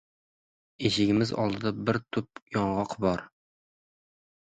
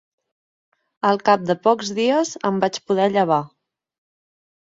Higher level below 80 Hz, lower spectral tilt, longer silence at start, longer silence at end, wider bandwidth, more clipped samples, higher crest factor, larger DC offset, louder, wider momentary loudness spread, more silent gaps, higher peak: first, -58 dBFS vs -68 dBFS; about the same, -6 dB/octave vs -5 dB/octave; second, 0.8 s vs 1.05 s; about the same, 1.15 s vs 1.2 s; first, 9.4 kHz vs 7.8 kHz; neither; about the same, 20 dB vs 18 dB; neither; second, -29 LUFS vs -20 LUFS; first, 9 LU vs 5 LU; first, 2.42-2.46 s vs none; second, -10 dBFS vs -4 dBFS